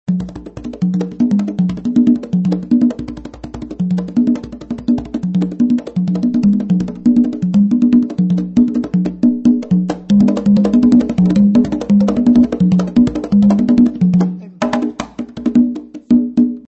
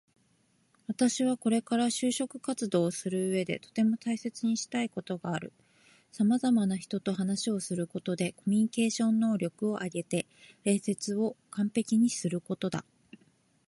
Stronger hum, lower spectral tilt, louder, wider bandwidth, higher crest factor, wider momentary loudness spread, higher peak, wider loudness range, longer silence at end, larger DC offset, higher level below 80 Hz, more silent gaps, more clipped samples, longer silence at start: neither; first, -9 dB/octave vs -5 dB/octave; first, -14 LUFS vs -30 LUFS; second, 8 kHz vs 11.5 kHz; second, 12 dB vs 18 dB; about the same, 10 LU vs 8 LU; first, -2 dBFS vs -12 dBFS; first, 5 LU vs 2 LU; second, 0.05 s vs 0.85 s; neither; first, -42 dBFS vs -74 dBFS; neither; neither; second, 0.1 s vs 0.9 s